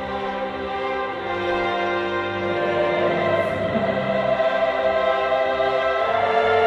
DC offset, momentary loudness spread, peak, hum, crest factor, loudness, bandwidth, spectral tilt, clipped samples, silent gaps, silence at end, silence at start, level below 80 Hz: under 0.1%; 6 LU; -6 dBFS; none; 14 dB; -22 LUFS; 8.4 kHz; -6 dB/octave; under 0.1%; none; 0 s; 0 s; -50 dBFS